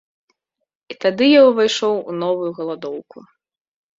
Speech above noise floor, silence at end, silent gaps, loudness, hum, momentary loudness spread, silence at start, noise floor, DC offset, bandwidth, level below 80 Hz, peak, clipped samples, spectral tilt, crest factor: 54 dB; 0.8 s; none; -17 LUFS; none; 18 LU; 0.9 s; -70 dBFS; under 0.1%; 7.8 kHz; -66 dBFS; -2 dBFS; under 0.1%; -4.5 dB/octave; 16 dB